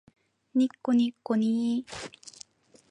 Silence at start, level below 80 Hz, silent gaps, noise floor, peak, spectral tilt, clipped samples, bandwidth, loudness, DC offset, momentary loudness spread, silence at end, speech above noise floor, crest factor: 0.55 s; -70 dBFS; none; -54 dBFS; -14 dBFS; -5.5 dB/octave; under 0.1%; 10.5 kHz; -27 LUFS; under 0.1%; 20 LU; 0.6 s; 27 dB; 16 dB